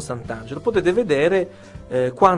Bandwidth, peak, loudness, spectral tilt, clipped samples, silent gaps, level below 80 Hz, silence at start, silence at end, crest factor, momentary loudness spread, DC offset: 11.5 kHz; 0 dBFS; -21 LUFS; -6 dB/octave; under 0.1%; none; -48 dBFS; 0 s; 0 s; 20 dB; 13 LU; under 0.1%